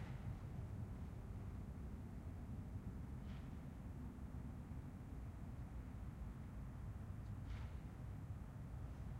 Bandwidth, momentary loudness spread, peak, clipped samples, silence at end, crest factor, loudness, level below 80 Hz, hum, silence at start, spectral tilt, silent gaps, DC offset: 16 kHz; 2 LU; -38 dBFS; under 0.1%; 0 s; 12 dB; -52 LUFS; -54 dBFS; none; 0 s; -8 dB/octave; none; under 0.1%